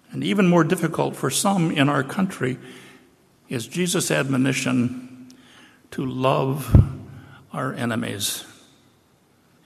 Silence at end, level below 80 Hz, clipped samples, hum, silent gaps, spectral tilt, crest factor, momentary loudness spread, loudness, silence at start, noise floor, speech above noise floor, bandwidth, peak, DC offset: 1.15 s; -36 dBFS; under 0.1%; none; none; -5 dB/octave; 20 dB; 16 LU; -22 LUFS; 0.1 s; -59 dBFS; 38 dB; 14.5 kHz; -4 dBFS; under 0.1%